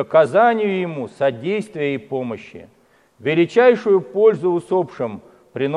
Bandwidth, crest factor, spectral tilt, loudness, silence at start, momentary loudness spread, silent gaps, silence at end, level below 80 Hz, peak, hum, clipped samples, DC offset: 10.5 kHz; 16 dB; -7 dB/octave; -18 LUFS; 0 s; 14 LU; none; 0 s; -68 dBFS; -2 dBFS; none; under 0.1%; under 0.1%